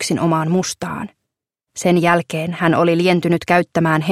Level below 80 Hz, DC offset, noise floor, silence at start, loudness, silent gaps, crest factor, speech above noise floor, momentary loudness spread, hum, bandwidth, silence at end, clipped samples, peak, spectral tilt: -56 dBFS; under 0.1%; -80 dBFS; 0 s; -17 LUFS; none; 18 dB; 63 dB; 11 LU; none; 15 kHz; 0 s; under 0.1%; 0 dBFS; -5.5 dB/octave